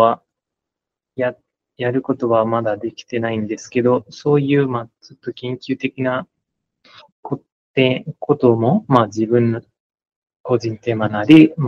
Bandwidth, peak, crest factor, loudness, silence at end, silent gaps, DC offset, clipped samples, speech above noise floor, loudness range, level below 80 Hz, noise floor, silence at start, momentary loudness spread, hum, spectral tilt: 7.2 kHz; 0 dBFS; 18 dB; -18 LUFS; 0 s; 7.12-7.23 s, 7.52-7.74 s, 9.80-9.90 s, 10.16-10.22 s, 10.36-10.44 s; under 0.1%; under 0.1%; 68 dB; 5 LU; -62 dBFS; -85 dBFS; 0 s; 14 LU; none; -7.5 dB/octave